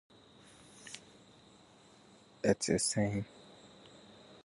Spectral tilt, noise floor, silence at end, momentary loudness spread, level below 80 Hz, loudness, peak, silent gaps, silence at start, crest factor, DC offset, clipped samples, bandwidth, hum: -4 dB/octave; -61 dBFS; 0.1 s; 26 LU; -64 dBFS; -33 LUFS; -14 dBFS; none; 0.8 s; 24 dB; under 0.1%; under 0.1%; 11.5 kHz; none